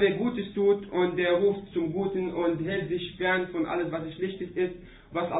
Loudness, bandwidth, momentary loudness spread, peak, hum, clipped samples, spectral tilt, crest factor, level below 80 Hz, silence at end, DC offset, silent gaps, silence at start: -28 LUFS; 4 kHz; 8 LU; -12 dBFS; none; under 0.1%; -10.5 dB/octave; 16 dB; -56 dBFS; 0 s; under 0.1%; none; 0 s